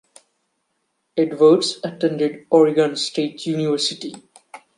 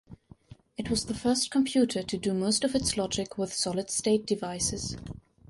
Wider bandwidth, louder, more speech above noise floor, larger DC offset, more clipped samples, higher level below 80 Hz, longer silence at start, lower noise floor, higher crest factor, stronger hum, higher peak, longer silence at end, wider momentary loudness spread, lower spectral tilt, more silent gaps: about the same, 11.5 kHz vs 11.5 kHz; first, -19 LUFS vs -28 LUFS; first, 54 dB vs 24 dB; neither; neither; second, -72 dBFS vs -52 dBFS; first, 1.15 s vs 0.1 s; first, -72 dBFS vs -53 dBFS; about the same, 18 dB vs 16 dB; neither; first, -2 dBFS vs -14 dBFS; second, 0.2 s vs 0.35 s; about the same, 10 LU vs 10 LU; about the same, -5 dB/octave vs -4 dB/octave; neither